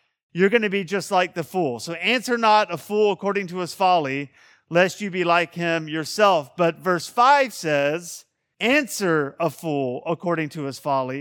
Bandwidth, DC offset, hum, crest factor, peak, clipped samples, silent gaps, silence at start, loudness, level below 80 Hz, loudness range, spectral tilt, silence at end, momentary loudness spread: 18 kHz; under 0.1%; none; 20 dB; -2 dBFS; under 0.1%; none; 0.35 s; -22 LUFS; -72 dBFS; 3 LU; -4.5 dB/octave; 0 s; 9 LU